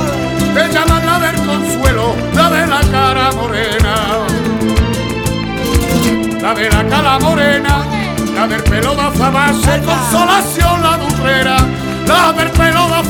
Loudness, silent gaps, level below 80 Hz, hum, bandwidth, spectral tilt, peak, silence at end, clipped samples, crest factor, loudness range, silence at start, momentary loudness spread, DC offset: -12 LUFS; none; -22 dBFS; none; 19 kHz; -4.5 dB/octave; 0 dBFS; 0 s; under 0.1%; 12 dB; 2 LU; 0 s; 5 LU; under 0.1%